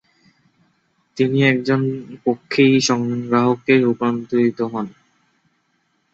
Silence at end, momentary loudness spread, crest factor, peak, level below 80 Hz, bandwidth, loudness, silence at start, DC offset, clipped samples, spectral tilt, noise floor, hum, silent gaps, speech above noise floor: 1.25 s; 10 LU; 18 dB; -2 dBFS; -62 dBFS; 8 kHz; -18 LUFS; 1.15 s; under 0.1%; under 0.1%; -5.5 dB/octave; -66 dBFS; none; none; 49 dB